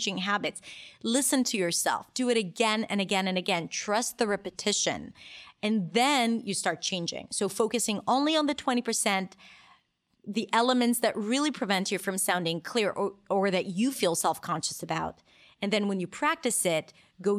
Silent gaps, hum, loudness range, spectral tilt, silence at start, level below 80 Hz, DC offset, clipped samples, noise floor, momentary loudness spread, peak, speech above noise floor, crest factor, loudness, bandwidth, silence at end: none; none; 2 LU; -3 dB/octave; 0 s; -70 dBFS; under 0.1%; under 0.1%; -70 dBFS; 9 LU; -10 dBFS; 41 dB; 18 dB; -28 LUFS; 16 kHz; 0 s